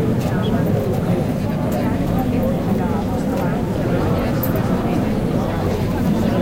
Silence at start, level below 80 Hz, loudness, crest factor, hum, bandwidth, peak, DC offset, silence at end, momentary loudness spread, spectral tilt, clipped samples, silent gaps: 0 s; -32 dBFS; -19 LUFS; 12 dB; none; 17 kHz; -6 dBFS; under 0.1%; 0 s; 2 LU; -8 dB/octave; under 0.1%; none